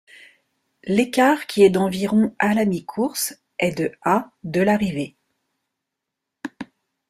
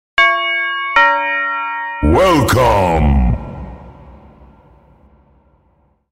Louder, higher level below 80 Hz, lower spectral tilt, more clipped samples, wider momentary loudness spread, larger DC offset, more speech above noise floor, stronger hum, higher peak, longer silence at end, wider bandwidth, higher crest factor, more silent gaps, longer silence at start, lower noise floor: second, -20 LUFS vs -13 LUFS; second, -58 dBFS vs -24 dBFS; about the same, -5.5 dB/octave vs -5.5 dB/octave; neither; first, 18 LU vs 11 LU; neither; first, 63 dB vs 45 dB; neither; about the same, -2 dBFS vs 0 dBFS; second, 0.45 s vs 1.95 s; about the same, 16 kHz vs 16 kHz; about the same, 20 dB vs 16 dB; neither; first, 0.85 s vs 0.15 s; first, -82 dBFS vs -57 dBFS